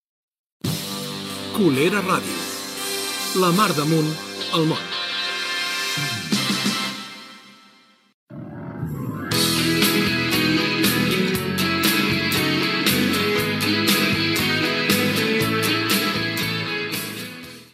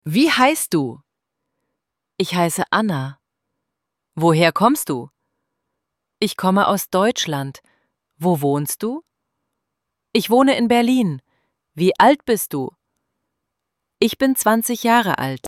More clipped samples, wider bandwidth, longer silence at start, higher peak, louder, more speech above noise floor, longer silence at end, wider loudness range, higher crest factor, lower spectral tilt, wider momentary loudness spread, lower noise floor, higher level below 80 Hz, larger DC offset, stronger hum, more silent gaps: neither; about the same, 16 kHz vs 16.5 kHz; first, 0.65 s vs 0.05 s; about the same, -4 dBFS vs -2 dBFS; about the same, -20 LUFS vs -18 LUFS; second, 34 dB vs 63 dB; about the same, 0.1 s vs 0 s; about the same, 6 LU vs 5 LU; about the same, 18 dB vs 18 dB; about the same, -3.5 dB/octave vs -4.5 dB/octave; about the same, 11 LU vs 12 LU; second, -54 dBFS vs -80 dBFS; first, -54 dBFS vs -62 dBFS; neither; neither; first, 8.14-8.27 s vs none